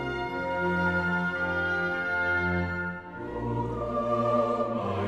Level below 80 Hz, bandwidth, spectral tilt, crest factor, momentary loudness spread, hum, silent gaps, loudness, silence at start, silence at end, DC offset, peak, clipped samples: -50 dBFS; 9.8 kHz; -7.5 dB/octave; 14 dB; 7 LU; none; none; -28 LUFS; 0 s; 0 s; under 0.1%; -14 dBFS; under 0.1%